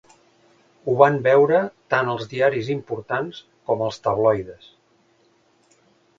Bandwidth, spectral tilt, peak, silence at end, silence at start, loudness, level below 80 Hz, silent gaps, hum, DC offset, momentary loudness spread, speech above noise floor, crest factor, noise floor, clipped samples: 7.6 kHz; -7 dB/octave; 0 dBFS; 1.65 s; 0.85 s; -21 LUFS; -60 dBFS; none; none; under 0.1%; 12 LU; 41 dB; 22 dB; -61 dBFS; under 0.1%